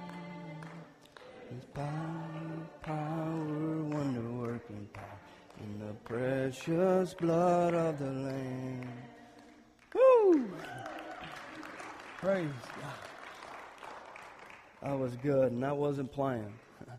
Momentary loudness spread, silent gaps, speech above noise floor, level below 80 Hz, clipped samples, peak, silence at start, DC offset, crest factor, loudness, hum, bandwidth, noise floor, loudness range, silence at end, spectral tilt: 21 LU; none; 27 dB; -68 dBFS; under 0.1%; -14 dBFS; 0 s; under 0.1%; 20 dB; -33 LUFS; none; 13.5 kHz; -59 dBFS; 9 LU; 0 s; -7.5 dB/octave